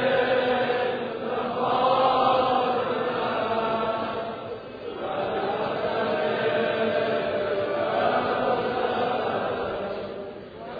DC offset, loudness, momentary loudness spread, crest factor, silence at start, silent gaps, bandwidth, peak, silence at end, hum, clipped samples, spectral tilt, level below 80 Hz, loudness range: under 0.1%; -25 LUFS; 12 LU; 16 dB; 0 s; none; 5 kHz; -10 dBFS; 0 s; none; under 0.1%; -7.5 dB/octave; -58 dBFS; 4 LU